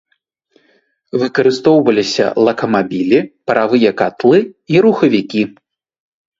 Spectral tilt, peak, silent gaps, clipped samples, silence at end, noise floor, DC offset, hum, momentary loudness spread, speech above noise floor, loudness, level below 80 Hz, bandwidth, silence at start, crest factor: -6 dB/octave; 0 dBFS; none; under 0.1%; 0.9 s; -64 dBFS; under 0.1%; none; 7 LU; 52 dB; -13 LUFS; -56 dBFS; 7.8 kHz; 1.15 s; 14 dB